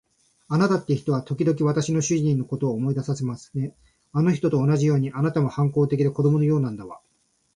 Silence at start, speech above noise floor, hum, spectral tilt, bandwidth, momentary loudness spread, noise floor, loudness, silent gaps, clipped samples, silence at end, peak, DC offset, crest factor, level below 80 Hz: 0.5 s; 46 dB; none; -7.5 dB/octave; 10.5 kHz; 9 LU; -68 dBFS; -23 LUFS; none; under 0.1%; 0.6 s; -8 dBFS; under 0.1%; 14 dB; -60 dBFS